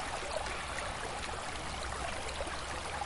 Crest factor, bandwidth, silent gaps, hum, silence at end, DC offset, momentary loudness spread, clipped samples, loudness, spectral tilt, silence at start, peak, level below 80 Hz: 16 dB; 11.5 kHz; none; none; 0 s; under 0.1%; 2 LU; under 0.1%; -38 LUFS; -3 dB/octave; 0 s; -24 dBFS; -48 dBFS